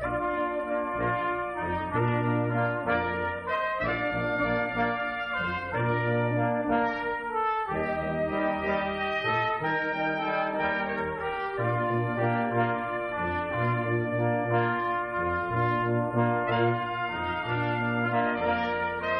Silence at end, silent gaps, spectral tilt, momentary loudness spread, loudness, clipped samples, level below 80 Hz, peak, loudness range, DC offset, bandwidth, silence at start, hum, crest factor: 0 s; none; -8.5 dB/octave; 4 LU; -28 LUFS; under 0.1%; -52 dBFS; -12 dBFS; 1 LU; under 0.1%; 9.4 kHz; 0 s; none; 16 dB